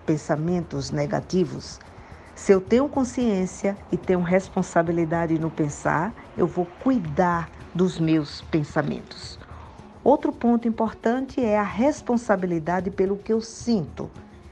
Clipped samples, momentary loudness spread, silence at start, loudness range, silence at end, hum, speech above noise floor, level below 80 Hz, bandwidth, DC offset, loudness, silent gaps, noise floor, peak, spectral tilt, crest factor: under 0.1%; 15 LU; 0 s; 2 LU; 0 s; none; 19 dB; -48 dBFS; 9.8 kHz; under 0.1%; -24 LUFS; none; -43 dBFS; -4 dBFS; -6.5 dB/octave; 20 dB